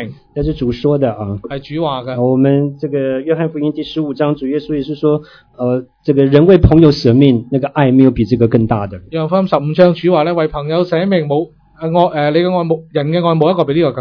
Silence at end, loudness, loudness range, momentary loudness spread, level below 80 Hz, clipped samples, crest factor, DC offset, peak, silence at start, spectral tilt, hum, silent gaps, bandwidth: 0 s; -14 LUFS; 6 LU; 10 LU; -32 dBFS; 0.4%; 12 dB; under 0.1%; 0 dBFS; 0 s; -9 dB/octave; none; none; 5.4 kHz